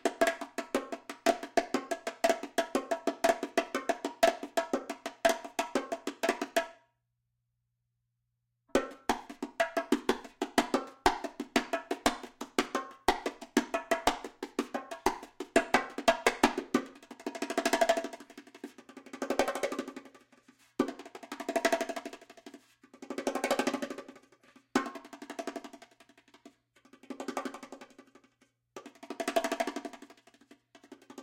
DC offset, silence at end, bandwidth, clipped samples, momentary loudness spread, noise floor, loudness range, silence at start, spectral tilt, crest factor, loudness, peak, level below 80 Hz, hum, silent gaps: under 0.1%; 0 s; 17 kHz; under 0.1%; 19 LU; -82 dBFS; 9 LU; 0.05 s; -2.5 dB/octave; 26 dB; -33 LUFS; -8 dBFS; -60 dBFS; none; none